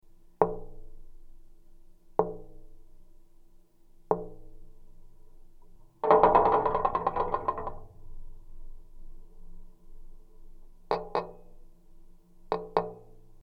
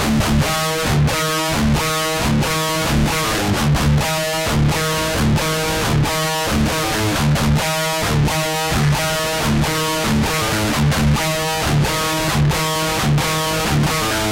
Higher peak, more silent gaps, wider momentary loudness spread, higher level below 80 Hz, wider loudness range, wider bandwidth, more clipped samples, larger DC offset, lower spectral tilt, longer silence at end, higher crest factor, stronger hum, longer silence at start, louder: about the same, -4 dBFS vs -6 dBFS; neither; first, 24 LU vs 2 LU; second, -48 dBFS vs -28 dBFS; first, 14 LU vs 0 LU; second, 6 kHz vs 16.5 kHz; neither; neither; first, -8 dB/octave vs -4.5 dB/octave; about the same, 0.05 s vs 0 s; first, 28 dB vs 10 dB; neither; about the same, 0.05 s vs 0 s; second, -28 LUFS vs -17 LUFS